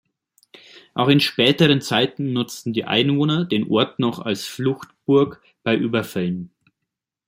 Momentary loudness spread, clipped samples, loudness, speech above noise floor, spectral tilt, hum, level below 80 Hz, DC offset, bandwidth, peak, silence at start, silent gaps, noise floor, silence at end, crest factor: 10 LU; under 0.1%; -20 LUFS; 62 dB; -5.5 dB/octave; none; -60 dBFS; under 0.1%; 16.5 kHz; -2 dBFS; 0.95 s; none; -82 dBFS; 0.8 s; 20 dB